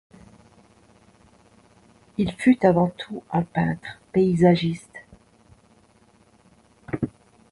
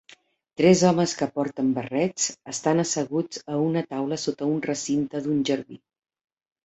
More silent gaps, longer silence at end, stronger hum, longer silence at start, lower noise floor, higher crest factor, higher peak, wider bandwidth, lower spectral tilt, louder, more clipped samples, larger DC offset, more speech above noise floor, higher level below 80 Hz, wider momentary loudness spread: neither; second, 0.4 s vs 0.9 s; neither; first, 2.2 s vs 0.6 s; about the same, -58 dBFS vs -55 dBFS; about the same, 22 dB vs 20 dB; about the same, -4 dBFS vs -6 dBFS; first, 11.5 kHz vs 8.2 kHz; first, -8 dB/octave vs -5 dB/octave; about the same, -23 LUFS vs -24 LUFS; neither; neither; first, 37 dB vs 31 dB; first, -54 dBFS vs -64 dBFS; first, 18 LU vs 9 LU